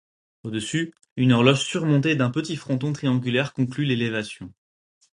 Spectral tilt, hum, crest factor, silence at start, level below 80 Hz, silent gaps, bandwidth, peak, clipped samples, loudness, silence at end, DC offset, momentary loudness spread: -6 dB/octave; none; 22 dB; 0.45 s; -60 dBFS; 1.11-1.16 s; 11 kHz; -2 dBFS; under 0.1%; -23 LUFS; 0.7 s; under 0.1%; 14 LU